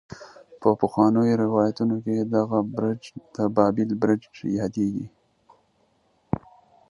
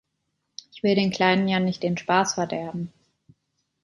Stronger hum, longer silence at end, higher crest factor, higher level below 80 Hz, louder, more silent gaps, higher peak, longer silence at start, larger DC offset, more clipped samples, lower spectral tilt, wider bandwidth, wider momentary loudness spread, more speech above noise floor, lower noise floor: neither; second, 0.5 s vs 0.95 s; about the same, 22 dB vs 20 dB; first, -56 dBFS vs -64 dBFS; about the same, -24 LUFS vs -23 LUFS; neither; about the same, -4 dBFS vs -4 dBFS; second, 0.1 s vs 0.75 s; neither; neither; first, -8.5 dB/octave vs -5 dB/octave; about the same, 10.5 kHz vs 11.5 kHz; second, 13 LU vs 19 LU; second, 43 dB vs 54 dB; second, -66 dBFS vs -77 dBFS